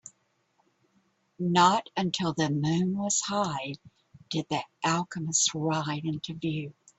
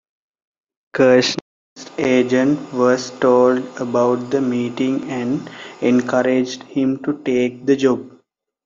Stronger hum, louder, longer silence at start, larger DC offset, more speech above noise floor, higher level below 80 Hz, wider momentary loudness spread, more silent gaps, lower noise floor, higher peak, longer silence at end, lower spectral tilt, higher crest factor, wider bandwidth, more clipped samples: neither; second, -28 LUFS vs -18 LUFS; second, 0.05 s vs 0.95 s; neither; about the same, 43 dB vs 41 dB; second, -68 dBFS vs -62 dBFS; about the same, 11 LU vs 9 LU; second, none vs 1.41-1.76 s; first, -71 dBFS vs -59 dBFS; second, -8 dBFS vs -2 dBFS; second, 0.3 s vs 0.55 s; second, -4 dB/octave vs -5.5 dB/octave; about the same, 20 dB vs 16 dB; first, 8.4 kHz vs 7.6 kHz; neither